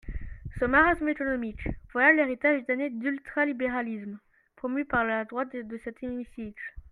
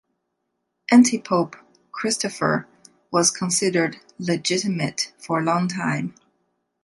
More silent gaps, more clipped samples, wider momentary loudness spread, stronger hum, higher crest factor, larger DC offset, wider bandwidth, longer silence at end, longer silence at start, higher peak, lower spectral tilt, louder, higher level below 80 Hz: neither; neither; first, 18 LU vs 12 LU; neither; about the same, 20 dB vs 20 dB; neither; about the same, 11 kHz vs 11.5 kHz; second, 0.05 s vs 0.75 s; second, 0.05 s vs 0.9 s; second, -8 dBFS vs -4 dBFS; first, -7.5 dB/octave vs -4 dB/octave; second, -27 LUFS vs -22 LUFS; first, -46 dBFS vs -68 dBFS